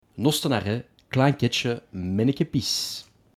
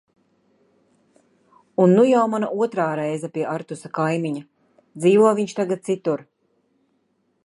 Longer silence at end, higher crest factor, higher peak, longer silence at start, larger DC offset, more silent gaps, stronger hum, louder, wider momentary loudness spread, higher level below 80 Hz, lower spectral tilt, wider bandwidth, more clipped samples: second, 0.35 s vs 1.2 s; about the same, 20 dB vs 18 dB; about the same, -6 dBFS vs -4 dBFS; second, 0.15 s vs 1.8 s; neither; neither; neither; second, -25 LUFS vs -21 LUFS; second, 9 LU vs 14 LU; first, -60 dBFS vs -74 dBFS; second, -5 dB/octave vs -7 dB/octave; first, 17.5 kHz vs 11.5 kHz; neither